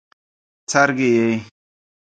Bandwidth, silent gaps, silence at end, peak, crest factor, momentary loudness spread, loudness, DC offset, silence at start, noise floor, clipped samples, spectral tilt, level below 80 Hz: 9.4 kHz; none; 0.75 s; 0 dBFS; 20 dB; 11 LU; -18 LUFS; under 0.1%; 0.7 s; under -90 dBFS; under 0.1%; -4.5 dB/octave; -64 dBFS